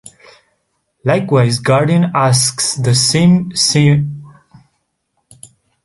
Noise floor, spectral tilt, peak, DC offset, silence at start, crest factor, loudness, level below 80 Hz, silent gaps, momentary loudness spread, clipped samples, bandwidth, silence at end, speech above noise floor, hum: -68 dBFS; -4.5 dB/octave; 0 dBFS; under 0.1%; 1.05 s; 14 dB; -13 LUFS; -50 dBFS; none; 6 LU; under 0.1%; 12 kHz; 1.55 s; 55 dB; none